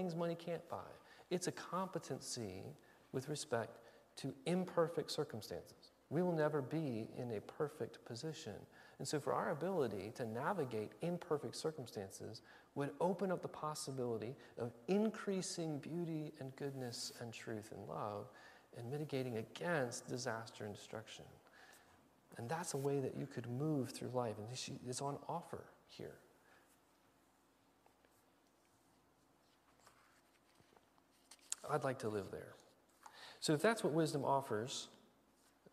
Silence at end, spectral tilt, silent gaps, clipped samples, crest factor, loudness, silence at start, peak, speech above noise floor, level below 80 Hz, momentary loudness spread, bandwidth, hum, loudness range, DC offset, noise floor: 0.75 s; -5 dB/octave; none; under 0.1%; 26 dB; -43 LUFS; 0 s; -18 dBFS; 31 dB; -82 dBFS; 16 LU; 15.5 kHz; none; 6 LU; under 0.1%; -74 dBFS